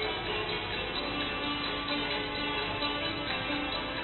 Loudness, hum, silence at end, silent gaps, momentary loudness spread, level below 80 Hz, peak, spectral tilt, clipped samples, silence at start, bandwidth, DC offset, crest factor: -32 LUFS; none; 0 s; none; 2 LU; -50 dBFS; -18 dBFS; -8 dB/octave; under 0.1%; 0 s; 4.3 kHz; under 0.1%; 14 dB